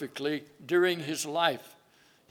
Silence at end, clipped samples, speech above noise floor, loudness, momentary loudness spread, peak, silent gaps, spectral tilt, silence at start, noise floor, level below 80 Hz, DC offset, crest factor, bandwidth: 0.6 s; under 0.1%; 33 dB; -29 LUFS; 9 LU; -10 dBFS; none; -3.5 dB/octave; 0 s; -63 dBFS; -84 dBFS; under 0.1%; 20 dB; 17.5 kHz